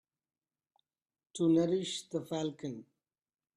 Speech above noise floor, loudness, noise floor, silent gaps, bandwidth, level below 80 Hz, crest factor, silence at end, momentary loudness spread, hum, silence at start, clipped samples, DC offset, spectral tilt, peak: over 57 dB; -34 LUFS; under -90 dBFS; none; 11 kHz; -78 dBFS; 18 dB; 0.75 s; 17 LU; none; 1.35 s; under 0.1%; under 0.1%; -6 dB/octave; -18 dBFS